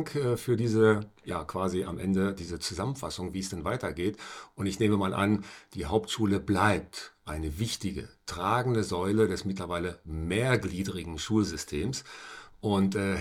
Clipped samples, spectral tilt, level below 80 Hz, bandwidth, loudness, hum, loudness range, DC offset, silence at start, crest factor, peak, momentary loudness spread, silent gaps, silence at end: under 0.1%; -5.5 dB/octave; -52 dBFS; 17 kHz; -30 LUFS; none; 3 LU; under 0.1%; 0 s; 20 dB; -10 dBFS; 11 LU; none; 0 s